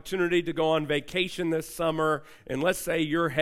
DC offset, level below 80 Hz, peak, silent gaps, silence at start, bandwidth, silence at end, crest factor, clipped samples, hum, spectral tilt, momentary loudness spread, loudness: under 0.1%; -54 dBFS; -12 dBFS; none; 0.05 s; 16 kHz; 0 s; 16 dB; under 0.1%; none; -5 dB/octave; 4 LU; -27 LUFS